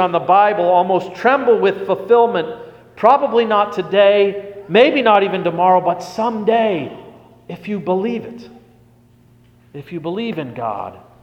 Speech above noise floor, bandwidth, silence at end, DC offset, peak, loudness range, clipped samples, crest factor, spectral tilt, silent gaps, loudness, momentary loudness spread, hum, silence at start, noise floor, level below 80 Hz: 34 dB; 8.6 kHz; 0.25 s; under 0.1%; 0 dBFS; 12 LU; under 0.1%; 16 dB; -6.5 dB/octave; none; -15 LUFS; 16 LU; none; 0 s; -50 dBFS; -60 dBFS